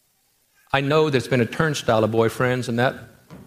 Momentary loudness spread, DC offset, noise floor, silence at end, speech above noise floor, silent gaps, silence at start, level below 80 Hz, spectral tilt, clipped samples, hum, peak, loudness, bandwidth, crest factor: 5 LU; under 0.1%; -65 dBFS; 0.05 s; 44 dB; none; 0.75 s; -54 dBFS; -5.5 dB/octave; under 0.1%; none; -4 dBFS; -21 LUFS; 15.5 kHz; 18 dB